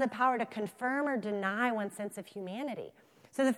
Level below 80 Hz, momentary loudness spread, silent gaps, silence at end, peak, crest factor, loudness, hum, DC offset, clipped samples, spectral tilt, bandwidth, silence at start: -84 dBFS; 13 LU; none; 0 s; -16 dBFS; 18 dB; -34 LUFS; none; under 0.1%; under 0.1%; -5 dB/octave; 15.5 kHz; 0 s